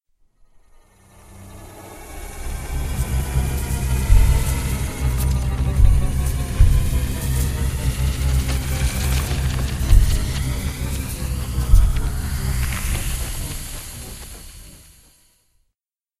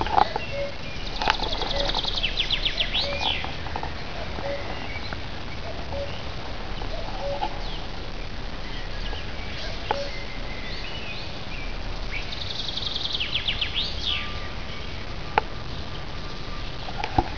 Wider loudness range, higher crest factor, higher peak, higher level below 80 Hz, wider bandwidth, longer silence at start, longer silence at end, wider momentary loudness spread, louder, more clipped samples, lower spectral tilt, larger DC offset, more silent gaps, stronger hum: about the same, 8 LU vs 8 LU; second, 20 dB vs 28 dB; about the same, 0 dBFS vs 0 dBFS; first, -22 dBFS vs -36 dBFS; first, 15.5 kHz vs 5.4 kHz; first, 1.3 s vs 0 s; first, 1.4 s vs 0 s; first, 18 LU vs 11 LU; first, -22 LUFS vs -29 LUFS; neither; about the same, -5 dB/octave vs -4 dB/octave; second, under 0.1% vs 2%; neither; neither